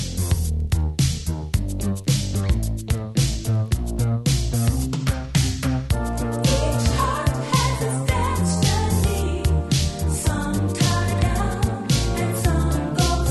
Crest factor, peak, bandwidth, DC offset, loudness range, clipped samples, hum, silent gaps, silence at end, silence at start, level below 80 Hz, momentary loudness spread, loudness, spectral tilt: 16 dB; -6 dBFS; 12.5 kHz; under 0.1%; 2 LU; under 0.1%; none; none; 0 s; 0 s; -28 dBFS; 4 LU; -22 LUFS; -5 dB/octave